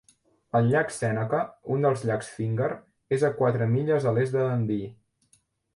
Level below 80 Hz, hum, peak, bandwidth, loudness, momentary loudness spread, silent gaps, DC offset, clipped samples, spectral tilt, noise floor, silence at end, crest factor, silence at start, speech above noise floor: -62 dBFS; none; -12 dBFS; 11.5 kHz; -26 LUFS; 7 LU; none; under 0.1%; under 0.1%; -7.5 dB/octave; -66 dBFS; 0.8 s; 14 dB; 0.55 s; 41 dB